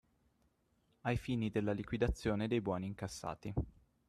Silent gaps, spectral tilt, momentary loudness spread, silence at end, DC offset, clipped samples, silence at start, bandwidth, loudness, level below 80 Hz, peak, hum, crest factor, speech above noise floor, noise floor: none; -6.5 dB/octave; 8 LU; 0.4 s; under 0.1%; under 0.1%; 1.05 s; 13 kHz; -39 LUFS; -52 dBFS; -20 dBFS; none; 18 dB; 39 dB; -76 dBFS